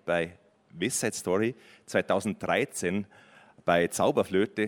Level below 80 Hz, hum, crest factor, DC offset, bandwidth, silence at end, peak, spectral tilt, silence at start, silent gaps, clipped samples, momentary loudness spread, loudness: -66 dBFS; none; 20 dB; under 0.1%; 18 kHz; 0 s; -8 dBFS; -4.5 dB/octave; 0.05 s; none; under 0.1%; 9 LU; -28 LUFS